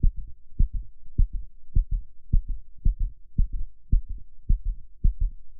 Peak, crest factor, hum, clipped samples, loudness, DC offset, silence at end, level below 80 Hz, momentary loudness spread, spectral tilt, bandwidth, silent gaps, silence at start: -8 dBFS; 16 dB; none; under 0.1%; -32 LUFS; under 0.1%; 0 s; -26 dBFS; 11 LU; -25 dB/octave; 0.5 kHz; none; 0 s